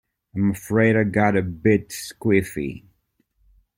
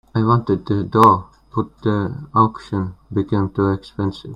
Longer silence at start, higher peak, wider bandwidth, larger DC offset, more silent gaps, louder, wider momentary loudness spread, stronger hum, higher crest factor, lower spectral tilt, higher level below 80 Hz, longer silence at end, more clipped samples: first, 0.35 s vs 0.15 s; second, -4 dBFS vs 0 dBFS; first, 16.5 kHz vs 12.5 kHz; neither; neither; about the same, -21 LUFS vs -19 LUFS; about the same, 14 LU vs 12 LU; neither; about the same, 18 dB vs 18 dB; second, -6.5 dB/octave vs -9 dB/octave; about the same, -52 dBFS vs -48 dBFS; first, 1 s vs 0 s; neither